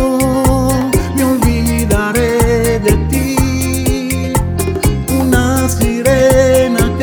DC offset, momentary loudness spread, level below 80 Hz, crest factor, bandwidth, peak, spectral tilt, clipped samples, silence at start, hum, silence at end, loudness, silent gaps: under 0.1%; 6 LU; -20 dBFS; 12 dB; over 20 kHz; 0 dBFS; -5.5 dB/octave; under 0.1%; 0 s; none; 0 s; -13 LUFS; none